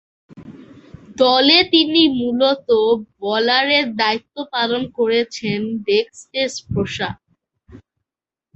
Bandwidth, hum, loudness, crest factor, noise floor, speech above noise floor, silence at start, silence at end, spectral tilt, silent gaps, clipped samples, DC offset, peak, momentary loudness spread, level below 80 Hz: 8.4 kHz; none; -17 LUFS; 18 dB; -88 dBFS; 70 dB; 0.35 s; 0.8 s; -4.5 dB/octave; none; under 0.1%; under 0.1%; 0 dBFS; 13 LU; -50 dBFS